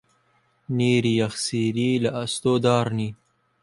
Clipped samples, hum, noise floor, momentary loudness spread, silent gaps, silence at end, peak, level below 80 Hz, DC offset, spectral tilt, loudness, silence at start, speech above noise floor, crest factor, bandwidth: under 0.1%; none; -65 dBFS; 8 LU; none; 0.5 s; -6 dBFS; -60 dBFS; under 0.1%; -5.5 dB/octave; -23 LUFS; 0.7 s; 43 dB; 18 dB; 11.5 kHz